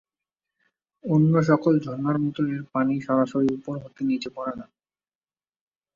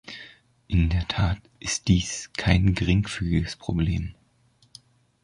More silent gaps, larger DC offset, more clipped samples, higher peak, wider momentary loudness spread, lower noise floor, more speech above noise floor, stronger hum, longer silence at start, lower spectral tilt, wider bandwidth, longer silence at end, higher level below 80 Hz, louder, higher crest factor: neither; neither; neither; about the same, -6 dBFS vs -4 dBFS; first, 13 LU vs 10 LU; first, under -90 dBFS vs -62 dBFS; first, over 67 dB vs 39 dB; neither; first, 1.05 s vs 0.05 s; first, -8.5 dB/octave vs -5 dB/octave; second, 7.4 kHz vs 11 kHz; first, 1.3 s vs 1.1 s; second, -64 dBFS vs -34 dBFS; about the same, -24 LUFS vs -25 LUFS; about the same, 18 dB vs 22 dB